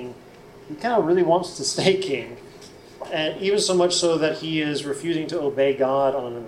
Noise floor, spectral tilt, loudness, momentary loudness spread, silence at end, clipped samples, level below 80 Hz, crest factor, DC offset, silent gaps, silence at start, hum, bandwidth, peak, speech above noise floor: -45 dBFS; -4 dB/octave; -22 LUFS; 11 LU; 0 s; under 0.1%; -60 dBFS; 18 dB; under 0.1%; none; 0 s; none; 13.5 kHz; -4 dBFS; 23 dB